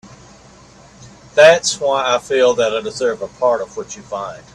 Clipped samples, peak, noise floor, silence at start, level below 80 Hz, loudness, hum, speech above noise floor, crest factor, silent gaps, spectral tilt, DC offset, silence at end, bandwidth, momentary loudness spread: under 0.1%; 0 dBFS; -44 dBFS; 0.05 s; -54 dBFS; -15 LUFS; none; 28 dB; 18 dB; none; -2 dB/octave; under 0.1%; 0.15 s; 11.5 kHz; 17 LU